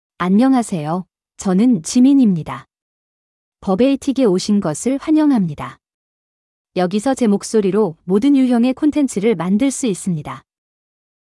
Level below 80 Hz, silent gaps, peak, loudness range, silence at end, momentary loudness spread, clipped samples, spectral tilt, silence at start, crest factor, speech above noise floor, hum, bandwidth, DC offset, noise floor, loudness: -54 dBFS; 2.82-3.52 s, 5.94-6.65 s; -4 dBFS; 2 LU; 0.9 s; 12 LU; under 0.1%; -6 dB/octave; 0.2 s; 12 dB; over 75 dB; none; 12 kHz; under 0.1%; under -90 dBFS; -16 LUFS